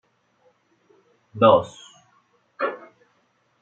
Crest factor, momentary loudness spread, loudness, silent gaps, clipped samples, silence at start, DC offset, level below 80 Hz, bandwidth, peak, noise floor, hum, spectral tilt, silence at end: 24 dB; 26 LU; -20 LUFS; none; under 0.1%; 1.35 s; under 0.1%; -72 dBFS; 8 kHz; -2 dBFS; -66 dBFS; none; -6.5 dB/octave; 0.85 s